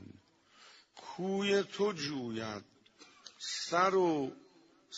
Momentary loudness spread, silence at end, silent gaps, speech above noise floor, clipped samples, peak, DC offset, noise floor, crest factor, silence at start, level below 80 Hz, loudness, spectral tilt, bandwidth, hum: 22 LU; 0 s; none; 30 dB; under 0.1%; -14 dBFS; under 0.1%; -63 dBFS; 22 dB; 0 s; -78 dBFS; -34 LUFS; -4.5 dB/octave; 8 kHz; none